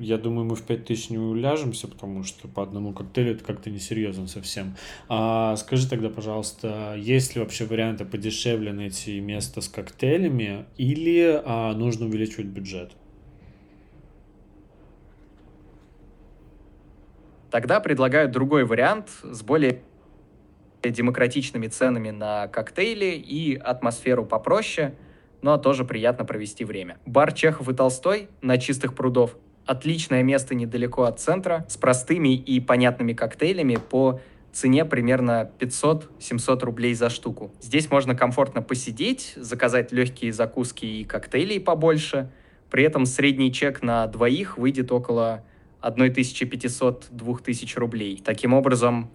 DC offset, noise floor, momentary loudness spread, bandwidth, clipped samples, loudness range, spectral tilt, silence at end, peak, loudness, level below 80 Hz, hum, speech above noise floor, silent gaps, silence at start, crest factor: under 0.1%; -53 dBFS; 11 LU; 14 kHz; under 0.1%; 6 LU; -5.5 dB/octave; 0.05 s; -4 dBFS; -24 LUFS; -54 dBFS; none; 30 dB; none; 0 s; 20 dB